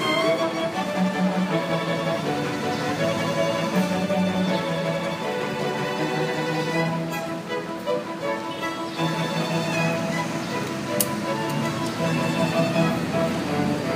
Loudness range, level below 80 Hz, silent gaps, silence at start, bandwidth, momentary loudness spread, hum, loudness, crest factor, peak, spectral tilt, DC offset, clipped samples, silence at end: 2 LU; -60 dBFS; none; 0 s; 15.5 kHz; 5 LU; none; -25 LUFS; 20 dB; -4 dBFS; -5 dB/octave; under 0.1%; under 0.1%; 0 s